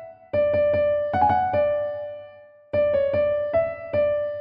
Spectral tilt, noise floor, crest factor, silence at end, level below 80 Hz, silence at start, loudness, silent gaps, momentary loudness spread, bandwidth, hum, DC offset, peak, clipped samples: -9 dB/octave; -47 dBFS; 14 dB; 0 s; -50 dBFS; 0 s; -23 LUFS; none; 8 LU; 5.2 kHz; none; under 0.1%; -8 dBFS; under 0.1%